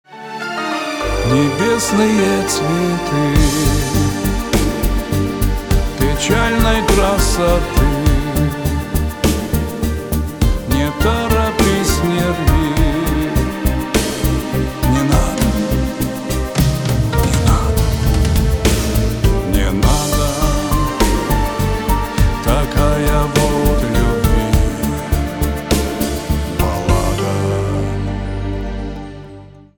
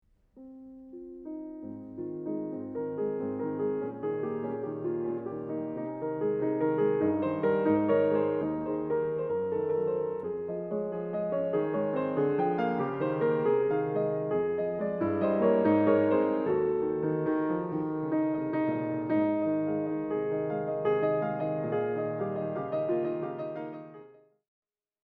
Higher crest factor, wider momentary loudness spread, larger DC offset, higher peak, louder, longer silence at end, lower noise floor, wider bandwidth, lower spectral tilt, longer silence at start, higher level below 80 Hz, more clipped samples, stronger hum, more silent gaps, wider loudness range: about the same, 14 dB vs 18 dB; second, 6 LU vs 10 LU; neither; first, -2 dBFS vs -12 dBFS; first, -16 LUFS vs -30 LUFS; second, 0.15 s vs 1 s; second, -37 dBFS vs -54 dBFS; first, over 20 kHz vs 4.1 kHz; second, -5.5 dB/octave vs -11 dB/octave; second, 0.1 s vs 0.35 s; first, -20 dBFS vs -66 dBFS; neither; neither; neither; second, 3 LU vs 7 LU